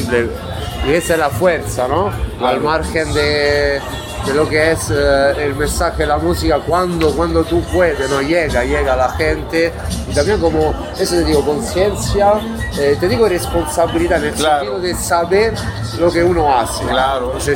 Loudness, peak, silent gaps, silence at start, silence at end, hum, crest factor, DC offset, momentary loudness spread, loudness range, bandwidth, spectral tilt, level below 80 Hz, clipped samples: -15 LUFS; -2 dBFS; none; 0 s; 0 s; none; 14 dB; under 0.1%; 5 LU; 1 LU; 17 kHz; -5 dB/octave; -28 dBFS; under 0.1%